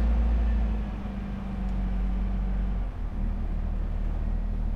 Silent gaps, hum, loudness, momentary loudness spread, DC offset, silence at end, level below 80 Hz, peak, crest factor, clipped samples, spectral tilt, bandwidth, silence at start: none; none; -31 LUFS; 8 LU; under 0.1%; 0 s; -28 dBFS; -16 dBFS; 10 dB; under 0.1%; -9 dB/octave; 4.3 kHz; 0 s